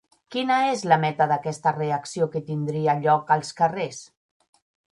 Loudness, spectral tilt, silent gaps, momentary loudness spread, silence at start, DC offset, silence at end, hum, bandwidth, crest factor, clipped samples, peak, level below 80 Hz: -23 LUFS; -5.5 dB/octave; none; 8 LU; 0.3 s; under 0.1%; 0.9 s; none; 11.5 kHz; 20 dB; under 0.1%; -4 dBFS; -70 dBFS